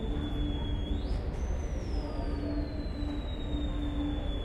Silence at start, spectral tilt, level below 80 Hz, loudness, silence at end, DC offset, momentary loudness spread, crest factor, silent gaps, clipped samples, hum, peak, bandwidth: 0 s; -7.5 dB/octave; -34 dBFS; -35 LUFS; 0 s; under 0.1%; 2 LU; 12 dB; none; under 0.1%; none; -20 dBFS; 8.4 kHz